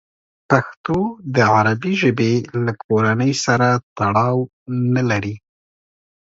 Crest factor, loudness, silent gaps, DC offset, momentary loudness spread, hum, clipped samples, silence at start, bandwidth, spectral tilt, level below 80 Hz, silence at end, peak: 18 dB; -18 LUFS; 0.77-0.84 s, 2.84-2.89 s, 3.83-3.96 s, 4.53-4.66 s; under 0.1%; 7 LU; none; under 0.1%; 0.5 s; 7.8 kHz; -6 dB/octave; -52 dBFS; 0.9 s; 0 dBFS